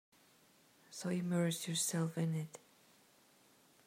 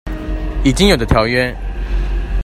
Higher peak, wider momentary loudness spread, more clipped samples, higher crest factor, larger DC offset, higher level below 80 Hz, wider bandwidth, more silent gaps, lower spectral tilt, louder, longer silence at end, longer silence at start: second, -24 dBFS vs 0 dBFS; first, 15 LU vs 12 LU; neither; about the same, 16 dB vs 16 dB; neither; second, -86 dBFS vs -20 dBFS; first, 16 kHz vs 13.5 kHz; neither; about the same, -4.5 dB/octave vs -5 dB/octave; second, -38 LUFS vs -16 LUFS; first, 1.3 s vs 0 s; first, 0.9 s vs 0.05 s